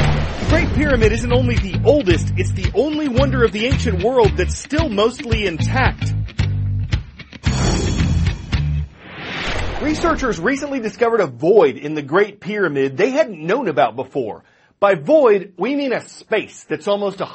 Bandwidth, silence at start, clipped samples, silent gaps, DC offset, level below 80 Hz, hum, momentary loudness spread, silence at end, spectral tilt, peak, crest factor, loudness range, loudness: 8.8 kHz; 0 s; under 0.1%; none; under 0.1%; -28 dBFS; none; 9 LU; 0 s; -6 dB/octave; 0 dBFS; 18 dB; 4 LU; -18 LUFS